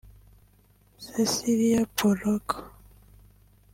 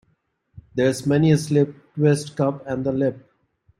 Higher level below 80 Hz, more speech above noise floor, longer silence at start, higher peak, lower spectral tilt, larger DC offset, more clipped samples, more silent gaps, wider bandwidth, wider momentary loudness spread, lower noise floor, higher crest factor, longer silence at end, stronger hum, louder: about the same, -56 dBFS vs -58 dBFS; second, 35 dB vs 48 dB; first, 1 s vs 0.55 s; second, -8 dBFS vs -4 dBFS; second, -4.5 dB/octave vs -7 dB/octave; neither; neither; neither; first, 16.5 kHz vs 12.5 kHz; first, 12 LU vs 8 LU; second, -60 dBFS vs -68 dBFS; about the same, 20 dB vs 18 dB; first, 1.05 s vs 0.6 s; first, 50 Hz at -45 dBFS vs none; second, -26 LUFS vs -21 LUFS